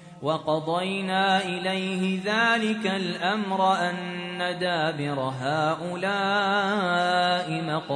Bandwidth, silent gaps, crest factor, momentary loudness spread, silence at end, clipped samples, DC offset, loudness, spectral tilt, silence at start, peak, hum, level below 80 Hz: 10.5 kHz; none; 16 dB; 6 LU; 0 s; under 0.1%; under 0.1%; -25 LUFS; -5 dB/octave; 0 s; -10 dBFS; none; -70 dBFS